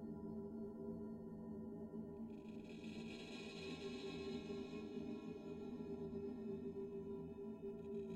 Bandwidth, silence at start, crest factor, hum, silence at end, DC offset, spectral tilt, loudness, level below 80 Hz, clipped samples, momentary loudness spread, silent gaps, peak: 11.5 kHz; 0 s; 14 dB; none; 0 s; under 0.1%; -6.5 dB/octave; -50 LUFS; -74 dBFS; under 0.1%; 3 LU; none; -36 dBFS